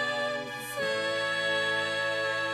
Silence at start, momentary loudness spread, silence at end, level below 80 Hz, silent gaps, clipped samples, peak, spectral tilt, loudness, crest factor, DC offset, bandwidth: 0 s; 5 LU; 0 s; -72 dBFS; none; under 0.1%; -18 dBFS; -2.5 dB/octave; -29 LUFS; 12 dB; under 0.1%; 13.5 kHz